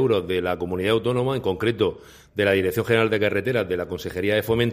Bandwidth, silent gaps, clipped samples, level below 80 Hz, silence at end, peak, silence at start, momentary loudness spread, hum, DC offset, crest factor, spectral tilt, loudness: 15.5 kHz; none; under 0.1%; -50 dBFS; 0 s; -4 dBFS; 0 s; 6 LU; none; under 0.1%; 18 dB; -6 dB/octave; -23 LUFS